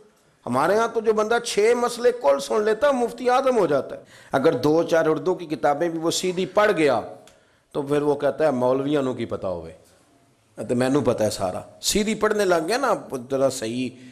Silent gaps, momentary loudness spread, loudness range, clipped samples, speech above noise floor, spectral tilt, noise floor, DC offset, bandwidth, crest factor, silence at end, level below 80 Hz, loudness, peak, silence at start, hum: none; 9 LU; 4 LU; under 0.1%; 37 dB; -4.5 dB/octave; -59 dBFS; under 0.1%; 14.5 kHz; 16 dB; 0 s; -54 dBFS; -22 LUFS; -6 dBFS; 0.45 s; none